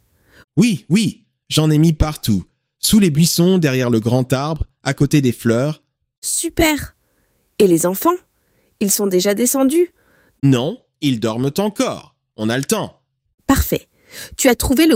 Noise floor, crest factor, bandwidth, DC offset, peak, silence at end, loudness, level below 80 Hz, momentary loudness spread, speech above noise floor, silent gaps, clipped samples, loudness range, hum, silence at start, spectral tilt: -62 dBFS; 16 dB; 16.5 kHz; under 0.1%; -2 dBFS; 0 s; -17 LUFS; -34 dBFS; 11 LU; 47 dB; 6.18-6.22 s, 13.34-13.38 s; under 0.1%; 4 LU; none; 0.55 s; -5 dB/octave